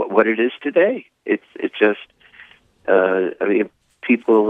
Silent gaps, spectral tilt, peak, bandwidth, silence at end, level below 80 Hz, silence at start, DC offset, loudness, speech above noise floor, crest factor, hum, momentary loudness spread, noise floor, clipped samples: none; -7.5 dB/octave; 0 dBFS; 3.9 kHz; 0 s; -70 dBFS; 0 s; under 0.1%; -19 LUFS; 30 dB; 18 dB; none; 12 LU; -47 dBFS; under 0.1%